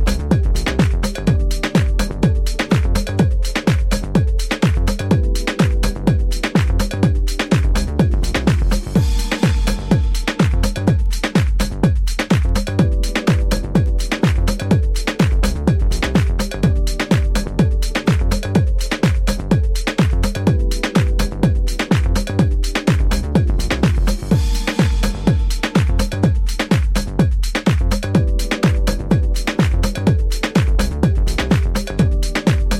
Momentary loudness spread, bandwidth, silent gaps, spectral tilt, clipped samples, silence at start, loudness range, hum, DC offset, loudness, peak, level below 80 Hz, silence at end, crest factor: 2 LU; 15.5 kHz; none; -6 dB/octave; under 0.1%; 0 s; 0 LU; none; under 0.1%; -18 LUFS; 0 dBFS; -18 dBFS; 0 s; 14 dB